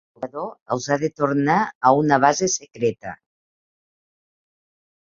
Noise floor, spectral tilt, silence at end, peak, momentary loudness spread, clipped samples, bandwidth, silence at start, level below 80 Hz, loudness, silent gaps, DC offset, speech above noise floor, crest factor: under -90 dBFS; -4.5 dB/octave; 1.9 s; -2 dBFS; 16 LU; under 0.1%; 7.6 kHz; 0.2 s; -62 dBFS; -20 LUFS; 0.62-0.66 s, 1.75-1.81 s; under 0.1%; over 70 dB; 22 dB